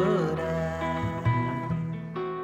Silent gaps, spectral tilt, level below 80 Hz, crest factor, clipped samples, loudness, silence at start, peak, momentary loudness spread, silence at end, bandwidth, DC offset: none; -8 dB/octave; -48 dBFS; 14 dB; under 0.1%; -29 LUFS; 0 s; -14 dBFS; 7 LU; 0 s; 8.6 kHz; under 0.1%